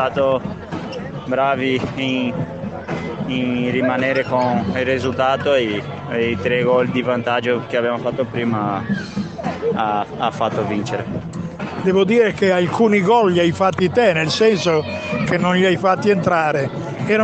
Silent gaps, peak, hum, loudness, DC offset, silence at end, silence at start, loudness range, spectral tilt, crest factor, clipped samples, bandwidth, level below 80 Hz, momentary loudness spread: none; -2 dBFS; none; -18 LUFS; under 0.1%; 0 s; 0 s; 6 LU; -6 dB/octave; 16 dB; under 0.1%; 8.6 kHz; -50 dBFS; 11 LU